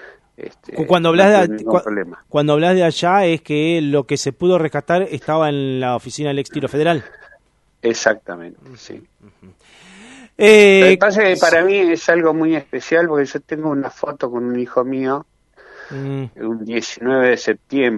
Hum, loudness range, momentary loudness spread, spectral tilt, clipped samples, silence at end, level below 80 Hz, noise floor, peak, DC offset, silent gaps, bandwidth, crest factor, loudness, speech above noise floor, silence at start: none; 10 LU; 14 LU; -5 dB/octave; under 0.1%; 0 s; -58 dBFS; -56 dBFS; 0 dBFS; under 0.1%; none; 11.5 kHz; 16 dB; -16 LUFS; 40 dB; 0.05 s